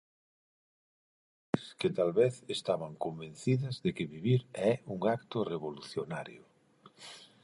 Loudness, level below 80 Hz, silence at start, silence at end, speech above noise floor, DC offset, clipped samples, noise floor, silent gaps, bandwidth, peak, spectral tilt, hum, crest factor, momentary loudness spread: -34 LUFS; -70 dBFS; 1.55 s; 0.2 s; 29 dB; under 0.1%; under 0.1%; -62 dBFS; none; 11.5 kHz; -12 dBFS; -6.5 dB/octave; none; 22 dB; 12 LU